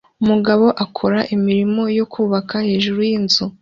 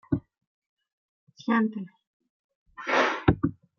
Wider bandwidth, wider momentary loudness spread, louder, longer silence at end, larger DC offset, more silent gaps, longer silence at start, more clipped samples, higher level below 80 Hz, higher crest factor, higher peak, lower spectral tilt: about the same, 7.4 kHz vs 7 kHz; second, 5 LU vs 14 LU; first, -17 LUFS vs -26 LUFS; second, 0.1 s vs 0.25 s; neither; second, none vs 0.47-0.77 s, 0.93-1.27 s, 2.07-2.20 s, 2.29-2.49 s, 2.55-2.66 s; about the same, 0.2 s vs 0.1 s; neither; about the same, -54 dBFS vs -50 dBFS; second, 14 dB vs 26 dB; about the same, -2 dBFS vs -4 dBFS; about the same, -6 dB/octave vs -6.5 dB/octave